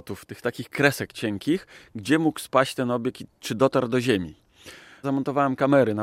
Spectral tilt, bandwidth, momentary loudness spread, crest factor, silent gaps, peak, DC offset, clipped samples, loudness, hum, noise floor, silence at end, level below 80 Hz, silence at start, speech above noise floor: -5.5 dB/octave; 16 kHz; 15 LU; 20 dB; none; -4 dBFS; under 0.1%; under 0.1%; -24 LUFS; none; -47 dBFS; 0 s; -64 dBFS; 0.05 s; 23 dB